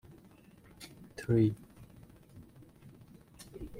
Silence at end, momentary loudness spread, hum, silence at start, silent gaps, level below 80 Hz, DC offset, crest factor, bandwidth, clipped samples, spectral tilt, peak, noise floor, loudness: 0 s; 28 LU; none; 0.8 s; none; -60 dBFS; under 0.1%; 22 dB; 16.5 kHz; under 0.1%; -8 dB/octave; -16 dBFS; -59 dBFS; -31 LUFS